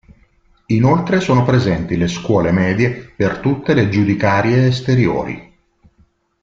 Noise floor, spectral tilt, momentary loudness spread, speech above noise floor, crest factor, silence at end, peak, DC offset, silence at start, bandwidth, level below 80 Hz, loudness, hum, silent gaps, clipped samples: -56 dBFS; -7.5 dB/octave; 6 LU; 41 dB; 14 dB; 1 s; -2 dBFS; under 0.1%; 0.7 s; 7.6 kHz; -42 dBFS; -16 LUFS; none; none; under 0.1%